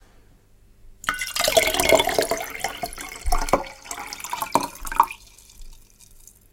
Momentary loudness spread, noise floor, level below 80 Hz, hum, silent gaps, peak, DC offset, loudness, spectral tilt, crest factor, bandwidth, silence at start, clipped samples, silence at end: 15 LU; -53 dBFS; -36 dBFS; 50 Hz at -55 dBFS; none; 0 dBFS; under 0.1%; -23 LUFS; -2 dB/octave; 24 dB; 17 kHz; 0.85 s; under 0.1%; 0.3 s